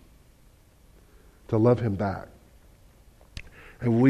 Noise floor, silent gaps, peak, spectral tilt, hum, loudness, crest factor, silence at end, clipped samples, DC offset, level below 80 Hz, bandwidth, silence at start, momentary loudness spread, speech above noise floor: -57 dBFS; none; -8 dBFS; -9.5 dB/octave; none; -26 LUFS; 20 dB; 0 s; under 0.1%; under 0.1%; -52 dBFS; 10.5 kHz; 1.5 s; 24 LU; 34 dB